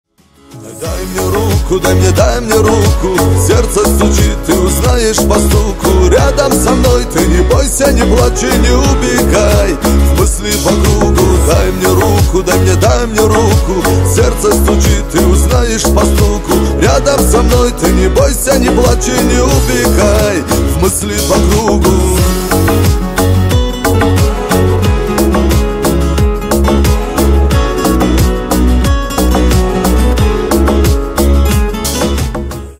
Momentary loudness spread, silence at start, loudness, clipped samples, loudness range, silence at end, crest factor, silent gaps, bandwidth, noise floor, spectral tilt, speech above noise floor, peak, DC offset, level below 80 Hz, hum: 3 LU; 0.5 s; -10 LUFS; under 0.1%; 2 LU; 0.05 s; 10 dB; none; 16.5 kHz; -41 dBFS; -5 dB/octave; 33 dB; 0 dBFS; under 0.1%; -14 dBFS; none